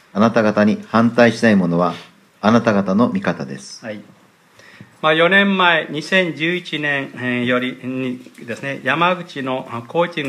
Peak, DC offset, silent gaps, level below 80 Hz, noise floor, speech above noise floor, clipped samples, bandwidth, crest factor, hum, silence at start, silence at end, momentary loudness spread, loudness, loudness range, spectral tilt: 0 dBFS; under 0.1%; none; -62 dBFS; -48 dBFS; 31 dB; under 0.1%; 11.5 kHz; 18 dB; none; 0.15 s; 0 s; 15 LU; -17 LUFS; 5 LU; -6 dB/octave